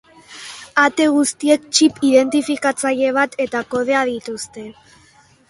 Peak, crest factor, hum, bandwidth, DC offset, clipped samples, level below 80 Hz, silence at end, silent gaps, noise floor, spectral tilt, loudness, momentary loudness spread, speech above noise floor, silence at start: 0 dBFS; 18 dB; none; 11.5 kHz; under 0.1%; under 0.1%; -60 dBFS; 0.75 s; none; -51 dBFS; -2.5 dB/octave; -17 LUFS; 18 LU; 34 dB; 0.3 s